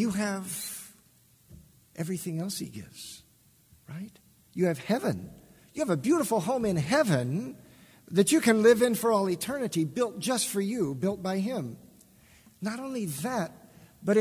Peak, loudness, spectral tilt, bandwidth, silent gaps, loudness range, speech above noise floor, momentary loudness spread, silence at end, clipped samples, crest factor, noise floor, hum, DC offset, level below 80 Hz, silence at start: -8 dBFS; -28 LUFS; -5 dB/octave; 16 kHz; none; 12 LU; 34 dB; 19 LU; 0 s; under 0.1%; 20 dB; -62 dBFS; none; under 0.1%; -64 dBFS; 0 s